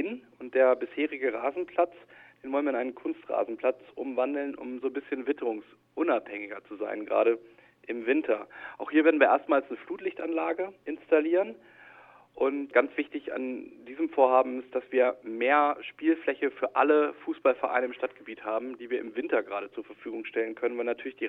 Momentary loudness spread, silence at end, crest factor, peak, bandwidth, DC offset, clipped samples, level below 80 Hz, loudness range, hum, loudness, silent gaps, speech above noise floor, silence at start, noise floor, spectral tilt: 14 LU; 0 s; 22 dB; -8 dBFS; 4 kHz; under 0.1%; under 0.1%; -76 dBFS; 5 LU; none; -29 LUFS; none; 26 dB; 0 s; -54 dBFS; -7 dB/octave